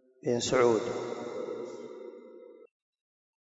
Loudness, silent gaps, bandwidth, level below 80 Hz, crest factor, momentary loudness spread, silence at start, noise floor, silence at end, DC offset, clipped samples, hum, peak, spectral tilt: -30 LUFS; none; 8 kHz; -70 dBFS; 20 dB; 24 LU; 0.25 s; -51 dBFS; 0.8 s; under 0.1%; under 0.1%; none; -12 dBFS; -4.5 dB/octave